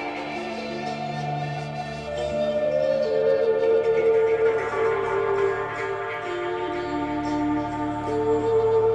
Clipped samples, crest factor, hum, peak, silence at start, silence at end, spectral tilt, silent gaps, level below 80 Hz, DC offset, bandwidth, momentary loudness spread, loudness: under 0.1%; 12 dB; none; -12 dBFS; 0 s; 0 s; -6.5 dB/octave; none; -50 dBFS; under 0.1%; 9 kHz; 10 LU; -24 LUFS